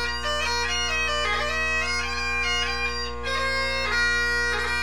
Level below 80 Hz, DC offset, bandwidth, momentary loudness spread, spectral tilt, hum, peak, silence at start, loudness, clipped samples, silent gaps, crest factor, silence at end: -38 dBFS; 2%; 17.5 kHz; 4 LU; -2 dB/octave; 60 Hz at -40 dBFS; -12 dBFS; 0 s; -24 LUFS; under 0.1%; none; 12 dB; 0 s